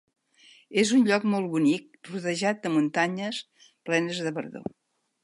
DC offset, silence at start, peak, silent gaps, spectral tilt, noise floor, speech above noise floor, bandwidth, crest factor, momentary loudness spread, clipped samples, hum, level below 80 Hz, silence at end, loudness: under 0.1%; 0.7 s; -10 dBFS; none; -5 dB/octave; -57 dBFS; 32 dB; 11.5 kHz; 18 dB; 16 LU; under 0.1%; none; -74 dBFS; 0.6 s; -26 LUFS